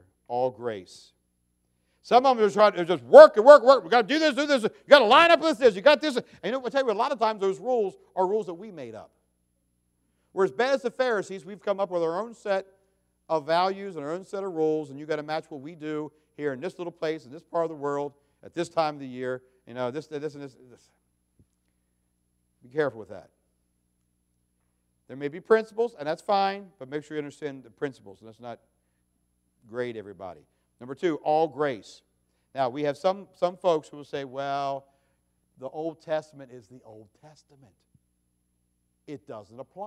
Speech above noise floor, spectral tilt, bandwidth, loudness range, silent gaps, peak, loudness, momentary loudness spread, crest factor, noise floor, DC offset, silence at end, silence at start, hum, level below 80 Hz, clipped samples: 49 dB; -4.5 dB/octave; 11.5 kHz; 20 LU; none; 0 dBFS; -24 LUFS; 21 LU; 26 dB; -73 dBFS; under 0.1%; 0 s; 0.3 s; 60 Hz at -65 dBFS; -74 dBFS; under 0.1%